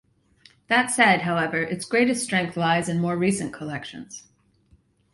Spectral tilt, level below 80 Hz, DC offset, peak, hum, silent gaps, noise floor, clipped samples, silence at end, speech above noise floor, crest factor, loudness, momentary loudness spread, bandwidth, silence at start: -4.5 dB/octave; -60 dBFS; under 0.1%; -4 dBFS; none; none; -61 dBFS; under 0.1%; 0.95 s; 37 dB; 20 dB; -22 LUFS; 17 LU; 11.5 kHz; 0.7 s